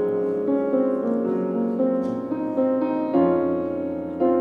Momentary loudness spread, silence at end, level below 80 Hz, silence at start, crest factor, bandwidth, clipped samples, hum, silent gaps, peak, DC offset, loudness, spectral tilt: 6 LU; 0 s; -62 dBFS; 0 s; 12 dB; 4.3 kHz; under 0.1%; none; none; -10 dBFS; under 0.1%; -23 LUFS; -10 dB/octave